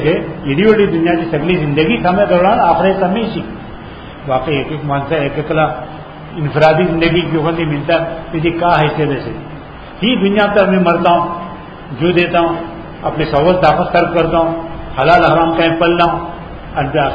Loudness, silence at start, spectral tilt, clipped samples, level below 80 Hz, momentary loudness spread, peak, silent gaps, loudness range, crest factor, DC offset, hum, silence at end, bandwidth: -13 LUFS; 0 s; -8.5 dB/octave; under 0.1%; -34 dBFS; 17 LU; 0 dBFS; none; 3 LU; 14 dB; 0.1%; none; 0 s; 6.8 kHz